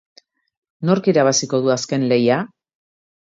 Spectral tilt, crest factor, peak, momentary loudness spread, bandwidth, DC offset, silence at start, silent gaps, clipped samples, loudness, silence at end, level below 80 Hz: -4.5 dB/octave; 16 dB; -2 dBFS; 7 LU; 8 kHz; under 0.1%; 0.8 s; none; under 0.1%; -18 LUFS; 0.85 s; -66 dBFS